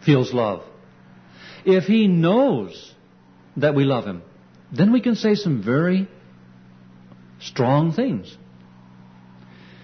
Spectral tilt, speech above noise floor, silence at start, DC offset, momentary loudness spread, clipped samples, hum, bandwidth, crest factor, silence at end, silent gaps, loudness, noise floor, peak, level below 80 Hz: -8 dB/octave; 32 dB; 0 s; under 0.1%; 18 LU; under 0.1%; none; 6.4 kHz; 18 dB; 1.55 s; none; -20 LUFS; -51 dBFS; -4 dBFS; -62 dBFS